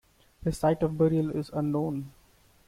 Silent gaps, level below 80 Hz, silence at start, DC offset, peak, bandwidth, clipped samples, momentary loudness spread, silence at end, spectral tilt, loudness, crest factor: none; -52 dBFS; 0.4 s; under 0.1%; -12 dBFS; 15 kHz; under 0.1%; 10 LU; 0.55 s; -8 dB/octave; -28 LUFS; 16 dB